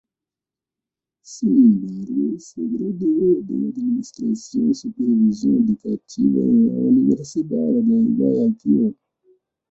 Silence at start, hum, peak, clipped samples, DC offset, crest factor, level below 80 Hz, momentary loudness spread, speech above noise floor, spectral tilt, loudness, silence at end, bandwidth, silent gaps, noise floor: 1.3 s; none; -4 dBFS; under 0.1%; under 0.1%; 14 dB; -60 dBFS; 9 LU; 70 dB; -9 dB/octave; -19 LUFS; 0.8 s; 8 kHz; none; -89 dBFS